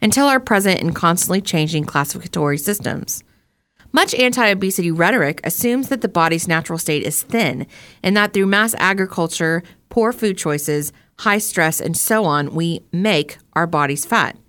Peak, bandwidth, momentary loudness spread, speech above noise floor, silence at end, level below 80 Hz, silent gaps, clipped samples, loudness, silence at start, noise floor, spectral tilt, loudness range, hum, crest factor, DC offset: -2 dBFS; 19 kHz; 7 LU; 43 dB; 0.15 s; -54 dBFS; none; under 0.1%; -17 LUFS; 0 s; -61 dBFS; -4 dB/octave; 2 LU; none; 16 dB; under 0.1%